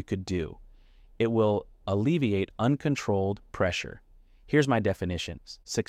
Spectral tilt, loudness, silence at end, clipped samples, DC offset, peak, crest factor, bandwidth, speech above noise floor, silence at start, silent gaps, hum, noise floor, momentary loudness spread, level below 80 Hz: -6 dB/octave; -28 LUFS; 0.05 s; under 0.1%; under 0.1%; -10 dBFS; 18 dB; 14.5 kHz; 27 dB; 0 s; none; none; -54 dBFS; 9 LU; -52 dBFS